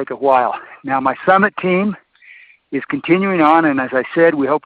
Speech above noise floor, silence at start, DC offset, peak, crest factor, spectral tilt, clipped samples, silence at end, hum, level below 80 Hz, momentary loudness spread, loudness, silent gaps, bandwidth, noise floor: 29 dB; 0 s; under 0.1%; 0 dBFS; 16 dB; -9 dB/octave; under 0.1%; 0.1 s; none; -60 dBFS; 11 LU; -15 LUFS; none; 4.9 kHz; -44 dBFS